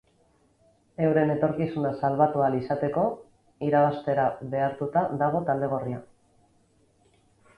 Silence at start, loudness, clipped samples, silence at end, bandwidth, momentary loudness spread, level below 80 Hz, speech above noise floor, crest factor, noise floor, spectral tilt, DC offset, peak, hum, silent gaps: 1 s; -26 LUFS; under 0.1%; 1.55 s; 10.5 kHz; 8 LU; -62 dBFS; 39 dB; 18 dB; -64 dBFS; -9.5 dB/octave; under 0.1%; -8 dBFS; none; none